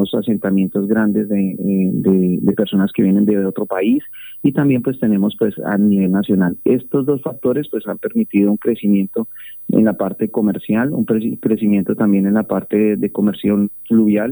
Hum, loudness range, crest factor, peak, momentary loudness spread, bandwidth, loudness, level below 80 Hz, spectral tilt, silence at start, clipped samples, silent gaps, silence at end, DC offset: none; 2 LU; 14 dB; -2 dBFS; 5 LU; over 20 kHz; -16 LUFS; -58 dBFS; -11 dB/octave; 0 s; under 0.1%; none; 0 s; under 0.1%